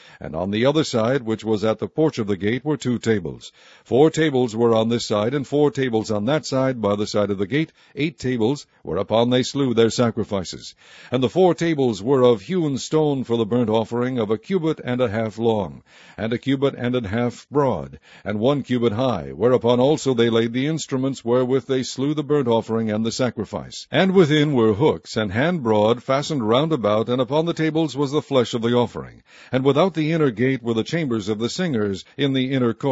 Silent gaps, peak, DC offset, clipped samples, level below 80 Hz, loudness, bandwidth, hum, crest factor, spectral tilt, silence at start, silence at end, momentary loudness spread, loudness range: none; -2 dBFS; under 0.1%; under 0.1%; -56 dBFS; -21 LUFS; 8 kHz; none; 18 dB; -6 dB/octave; 0.2 s; 0 s; 8 LU; 3 LU